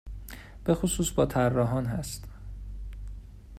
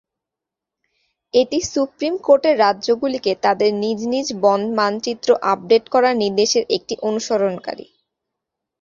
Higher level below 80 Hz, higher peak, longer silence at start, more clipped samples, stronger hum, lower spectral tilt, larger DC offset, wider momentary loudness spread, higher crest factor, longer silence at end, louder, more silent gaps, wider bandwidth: first, -42 dBFS vs -60 dBFS; second, -10 dBFS vs -2 dBFS; second, 0.05 s vs 1.35 s; neither; neither; first, -5.5 dB/octave vs -3.5 dB/octave; neither; first, 19 LU vs 7 LU; about the same, 20 dB vs 18 dB; second, 0 s vs 1 s; second, -28 LUFS vs -18 LUFS; neither; first, 16 kHz vs 7.6 kHz